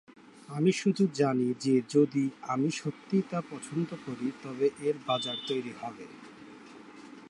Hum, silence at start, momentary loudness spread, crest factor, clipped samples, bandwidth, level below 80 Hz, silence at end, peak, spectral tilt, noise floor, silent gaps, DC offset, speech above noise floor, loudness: none; 0.25 s; 22 LU; 18 dB; under 0.1%; 11.5 kHz; -78 dBFS; 0 s; -12 dBFS; -6 dB/octave; -50 dBFS; none; under 0.1%; 20 dB; -30 LUFS